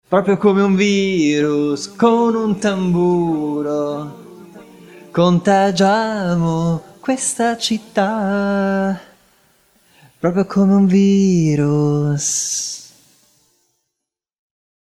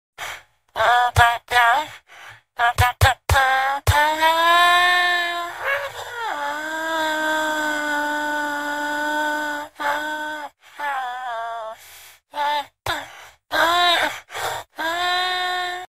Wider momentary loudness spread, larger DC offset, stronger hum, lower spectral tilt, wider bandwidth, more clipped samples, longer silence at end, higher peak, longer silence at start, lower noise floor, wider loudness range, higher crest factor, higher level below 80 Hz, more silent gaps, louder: second, 8 LU vs 15 LU; second, under 0.1% vs 0.2%; neither; first, -5.5 dB/octave vs -3 dB/octave; second, 13 kHz vs 16 kHz; neither; first, 1.95 s vs 0.05 s; about the same, -2 dBFS vs 0 dBFS; about the same, 0.1 s vs 0.2 s; first, -81 dBFS vs -46 dBFS; second, 4 LU vs 10 LU; second, 16 dB vs 22 dB; second, -54 dBFS vs -42 dBFS; neither; first, -16 LUFS vs -20 LUFS